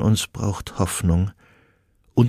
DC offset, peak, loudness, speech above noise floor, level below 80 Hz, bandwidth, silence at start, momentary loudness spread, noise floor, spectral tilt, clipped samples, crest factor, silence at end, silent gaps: under 0.1%; -4 dBFS; -23 LUFS; 39 dB; -38 dBFS; 15.5 kHz; 0 s; 6 LU; -61 dBFS; -6 dB/octave; under 0.1%; 18 dB; 0 s; none